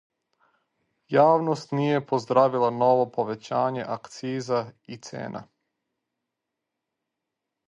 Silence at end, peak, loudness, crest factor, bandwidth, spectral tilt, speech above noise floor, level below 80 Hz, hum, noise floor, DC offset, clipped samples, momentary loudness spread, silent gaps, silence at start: 2.25 s; -6 dBFS; -24 LUFS; 22 dB; 10 kHz; -6.5 dB/octave; 60 dB; -74 dBFS; none; -84 dBFS; under 0.1%; under 0.1%; 16 LU; none; 1.1 s